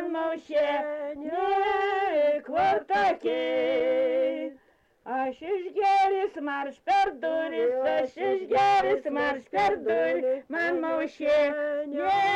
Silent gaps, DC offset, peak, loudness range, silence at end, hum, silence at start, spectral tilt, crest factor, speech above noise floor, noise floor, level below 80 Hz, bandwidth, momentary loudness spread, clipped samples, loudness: none; under 0.1%; -16 dBFS; 2 LU; 0 s; none; 0 s; -4.5 dB/octave; 10 dB; 37 dB; -63 dBFS; -64 dBFS; 9 kHz; 7 LU; under 0.1%; -26 LUFS